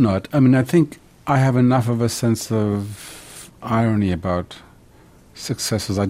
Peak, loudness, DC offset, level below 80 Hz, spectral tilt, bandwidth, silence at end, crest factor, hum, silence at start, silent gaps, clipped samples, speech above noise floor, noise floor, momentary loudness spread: -4 dBFS; -19 LUFS; under 0.1%; -48 dBFS; -6.5 dB/octave; 16 kHz; 0 s; 16 dB; none; 0 s; none; under 0.1%; 30 dB; -49 dBFS; 18 LU